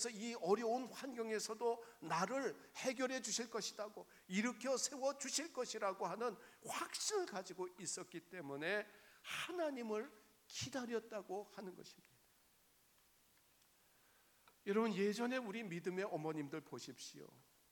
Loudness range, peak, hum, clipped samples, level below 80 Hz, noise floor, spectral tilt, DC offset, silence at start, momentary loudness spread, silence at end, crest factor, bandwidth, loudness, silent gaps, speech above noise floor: 8 LU; -24 dBFS; none; under 0.1%; -88 dBFS; -74 dBFS; -3 dB/octave; under 0.1%; 0 s; 13 LU; 0.3 s; 22 dB; 19 kHz; -43 LUFS; none; 30 dB